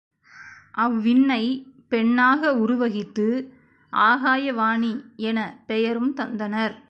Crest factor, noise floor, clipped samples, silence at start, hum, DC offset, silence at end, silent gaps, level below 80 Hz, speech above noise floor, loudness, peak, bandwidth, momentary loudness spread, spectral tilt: 16 dB; -46 dBFS; under 0.1%; 0.35 s; none; under 0.1%; 0.15 s; none; -68 dBFS; 24 dB; -22 LUFS; -6 dBFS; 6.6 kHz; 10 LU; -6.5 dB/octave